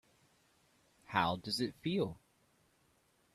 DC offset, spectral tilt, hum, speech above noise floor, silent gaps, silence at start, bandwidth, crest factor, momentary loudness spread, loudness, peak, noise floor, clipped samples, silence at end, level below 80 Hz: under 0.1%; -5 dB/octave; none; 37 dB; none; 1.1 s; 14 kHz; 26 dB; 6 LU; -37 LUFS; -14 dBFS; -73 dBFS; under 0.1%; 1.15 s; -70 dBFS